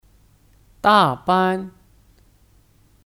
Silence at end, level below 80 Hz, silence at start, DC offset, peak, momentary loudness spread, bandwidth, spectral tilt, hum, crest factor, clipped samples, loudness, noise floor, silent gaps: 1.4 s; -54 dBFS; 0.85 s; under 0.1%; -2 dBFS; 12 LU; 16.5 kHz; -6 dB/octave; none; 20 dB; under 0.1%; -18 LUFS; -55 dBFS; none